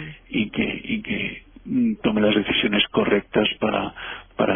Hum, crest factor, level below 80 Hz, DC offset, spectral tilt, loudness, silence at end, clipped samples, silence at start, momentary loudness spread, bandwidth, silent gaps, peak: none; 18 dB; -48 dBFS; under 0.1%; -9 dB/octave; -22 LUFS; 0 s; under 0.1%; 0 s; 10 LU; 3.6 kHz; none; -6 dBFS